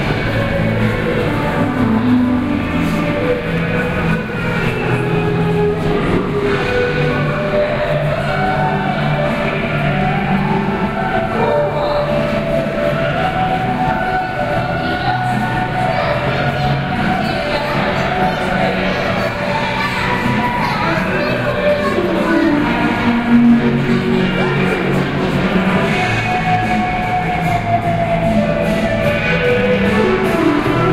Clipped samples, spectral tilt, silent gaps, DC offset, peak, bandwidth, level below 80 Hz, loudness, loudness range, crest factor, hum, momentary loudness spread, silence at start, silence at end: under 0.1%; -7 dB/octave; none; under 0.1%; -2 dBFS; 15.5 kHz; -32 dBFS; -16 LUFS; 3 LU; 14 dB; none; 3 LU; 0 s; 0 s